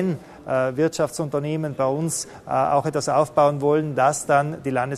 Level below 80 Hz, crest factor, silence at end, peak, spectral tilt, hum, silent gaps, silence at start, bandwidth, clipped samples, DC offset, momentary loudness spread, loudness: -58 dBFS; 16 dB; 0 s; -4 dBFS; -5.5 dB/octave; none; none; 0 s; 13.5 kHz; under 0.1%; under 0.1%; 7 LU; -22 LUFS